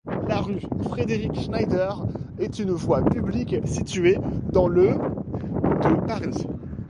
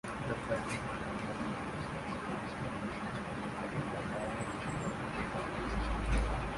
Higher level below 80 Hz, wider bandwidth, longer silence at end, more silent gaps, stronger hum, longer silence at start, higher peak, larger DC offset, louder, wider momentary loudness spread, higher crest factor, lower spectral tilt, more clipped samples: about the same, -40 dBFS vs -44 dBFS; about the same, 11 kHz vs 11.5 kHz; about the same, 0 s vs 0 s; neither; neither; about the same, 0.05 s vs 0.05 s; first, -6 dBFS vs -20 dBFS; neither; first, -24 LUFS vs -38 LUFS; first, 9 LU vs 5 LU; about the same, 18 dB vs 18 dB; first, -7.5 dB/octave vs -6 dB/octave; neither